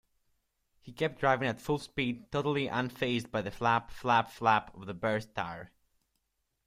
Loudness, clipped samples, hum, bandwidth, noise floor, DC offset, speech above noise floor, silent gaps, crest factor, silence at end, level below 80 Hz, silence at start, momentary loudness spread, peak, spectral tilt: -32 LUFS; under 0.1%; none; 16 kHz; -81 dBFS; under 0.1%; 49 dB; none; 20 dB; 1 s; -62 dBFS; 0.85 s; 10 LU; -12 dBFS; -6 dB/octave